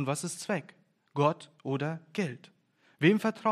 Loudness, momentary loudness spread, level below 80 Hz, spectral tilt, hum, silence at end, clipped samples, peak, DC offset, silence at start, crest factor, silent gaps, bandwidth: -31 LUFS; 12 LU; -82 dBFS; -5.5 dB/octave; none; 0 s; under 0.1%; -10 dBFS; under 0.1%; 0 s; 22 dB; none; 14 kHz